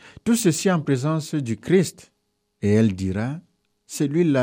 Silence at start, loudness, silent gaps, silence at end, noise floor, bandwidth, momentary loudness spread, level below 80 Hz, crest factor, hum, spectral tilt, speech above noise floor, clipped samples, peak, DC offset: 0.05 s; -22 LUFS; none; 0 s; -71 dBFS; 15.5 kHz; 9 LU; -60 dBFS; 16 dB; none; -6 dB/octave; 50 dB; under 0.1%; -6 dBFS; under 0.1%